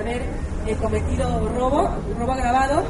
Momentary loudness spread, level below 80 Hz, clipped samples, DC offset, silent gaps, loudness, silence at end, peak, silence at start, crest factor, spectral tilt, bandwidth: 7 LU; -28 dBFS; under 0.1%; under 0.1%; none; -23 LUFS; 0 s; -6 dBFS; 0 s; 16 dB; -6.5 dB/octave; 11.5 kHz